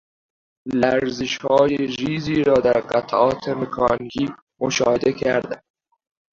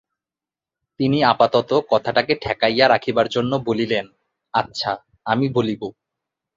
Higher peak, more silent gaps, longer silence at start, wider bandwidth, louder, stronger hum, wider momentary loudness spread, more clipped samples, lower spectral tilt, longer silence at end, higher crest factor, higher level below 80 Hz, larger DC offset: about the same, -2 dBFS vs -2 dBFS; first, 4.42-4.47 s vs none; second, 0.65 s vs 1 s; about the same, 7.6 kHz vs 7.6 kHz; about the same, -20 LUFS vs -20 LUFS; neither; about the same, 9 LU vs 9 LU; neither; about the same, -5 dB/octave vs -6 dB/octave; about the same, 0.75 s vs 0.65 s; about the same, 18 dB vs 20 dB; about the same, -52 dBFS vs -54 dBFS; neither